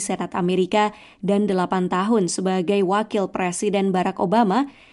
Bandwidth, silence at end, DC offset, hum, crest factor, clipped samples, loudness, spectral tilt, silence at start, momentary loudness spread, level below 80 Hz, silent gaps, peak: 11.5 kHz; 0.2 s; under 0.1%; none; 14 dB; under 0.1%; -21 LUFS; -5.5 dB/octave; 0 s; 5 LU; -60 dBFS; none; -6 dBFS